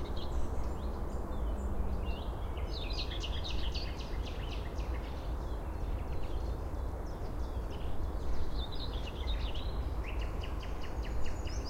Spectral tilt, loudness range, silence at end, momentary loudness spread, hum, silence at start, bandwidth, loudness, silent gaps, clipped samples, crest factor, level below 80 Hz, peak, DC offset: -6 dB/octave; 2 LU; 0 s; 3 LU; none; 0 s; 15.5 kHz; -40 LUFS; none; under 0.1%; 14 dB; -38 dBFS; -22 dBFS; under 0.1%